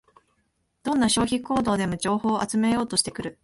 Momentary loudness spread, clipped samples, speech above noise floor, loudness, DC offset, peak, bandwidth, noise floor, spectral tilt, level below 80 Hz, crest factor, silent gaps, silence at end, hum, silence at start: 5 LU; under 0.1%; 48 dB; -24 LUFS; under 0.1%; -6 dBFS; 11.5 kHz; -72 dBFS; -4 dB/octave; -52 dBFS; 20 dB; none; 0.1 s; none; 0.85 s